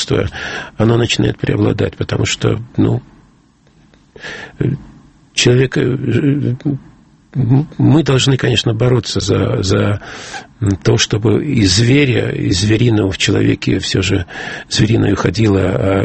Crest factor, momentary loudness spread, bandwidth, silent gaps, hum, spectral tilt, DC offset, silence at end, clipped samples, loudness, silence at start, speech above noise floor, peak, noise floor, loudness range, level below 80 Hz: 14 dB; 11 LU; 8.8 kHz; none; none; -5.5 dB/octave; under 0.1%; 0 s; under 0.1%; -14 LUFS; 0 s; 36 dB; 0 dBFS; -50 dBFS; 5 LU; -38 dBFS